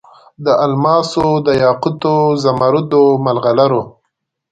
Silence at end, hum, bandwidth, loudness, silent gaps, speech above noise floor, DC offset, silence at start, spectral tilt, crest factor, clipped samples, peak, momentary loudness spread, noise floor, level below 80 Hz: 0.6 s; none; 9.2 kHz; -13 LUFS; none; 59 dB; under 0.1%; 0.4 s; -7 dB/octave; 14 dB; under 0.1%; 0 dBFS; 4 LU; -72 dBFS; -50 dBFS